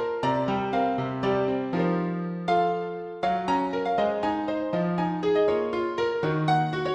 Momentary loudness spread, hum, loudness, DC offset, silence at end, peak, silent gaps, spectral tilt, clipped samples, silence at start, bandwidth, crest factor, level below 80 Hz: 4 LU; none; -26 LUFS; under 0.1%; 0 s; -12 dBFS; none; -7.5 dB/octave; under 0.1%; 0 s; 8.8 kHz; 14 dB; -58 dBFS